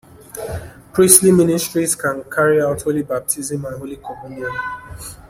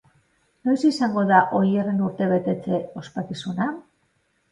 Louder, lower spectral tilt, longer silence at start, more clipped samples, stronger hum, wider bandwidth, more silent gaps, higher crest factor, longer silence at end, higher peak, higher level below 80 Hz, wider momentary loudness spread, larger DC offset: first, -16 LUFS vs -22 LUFS; second, -4 dB/octave vs -7 dB/octave; second, 0.2 s vs 0.65 s; neither; neither; first, 16.5 kHz vs 10.5 kHz; neither; about the same, 18 dB vs 22 dB; second, 0.1 s vs 0.7 s; about the same, 0 dBFS vs -2 dBFS; first, -48 dBFS vs -64 dBFS; first, 22 LU vs 13 LU; neither